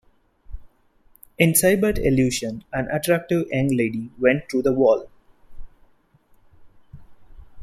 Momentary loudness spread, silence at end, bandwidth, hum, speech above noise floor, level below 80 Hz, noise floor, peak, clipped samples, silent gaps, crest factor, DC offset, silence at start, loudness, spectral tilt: 9 LU; 0 s; 16 kHz; none; 38 dB; -42 dBFS; -58 dBFS; -2 dBFS; under 0.1%; none; 20 dB; under 0.1%; 0.5 s; -21 LUFS; -5 dB/octave